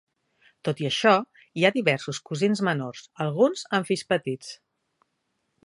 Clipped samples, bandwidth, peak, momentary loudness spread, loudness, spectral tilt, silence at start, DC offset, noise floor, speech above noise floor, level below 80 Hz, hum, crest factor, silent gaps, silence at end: under 0.1%; 11.5 kHz; -4 dBFS; 12 LU; -25 LUFS; -5 dB/octave; 0.65 s; under 0.1%; -76 dBFS; 52 dB; -72 dBFS; none; 22 dB; none; 1.1 s